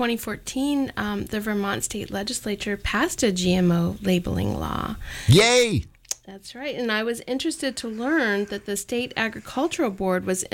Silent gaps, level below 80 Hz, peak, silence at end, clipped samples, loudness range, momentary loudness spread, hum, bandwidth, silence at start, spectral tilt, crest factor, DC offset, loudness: none; -44 dBFS; -4 dBFS; 0.05 s; under 0.1%; 5 LU; 10 LU; none; 17 kHz; 0 s; -4.5 dB/octave; 18 dB; under 0.1%; -24 LUFS